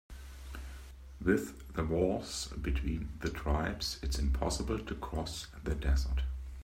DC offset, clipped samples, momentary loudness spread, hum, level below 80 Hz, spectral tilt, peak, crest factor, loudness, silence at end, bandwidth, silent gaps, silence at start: under 0.1%; under 0.1%; 15 LU; none; -38 dBFS; -5.5 dB/octave; -16 dBFS; 20 dB; -35 LUFS; 0 s; 16 kHz; none; 0.1 s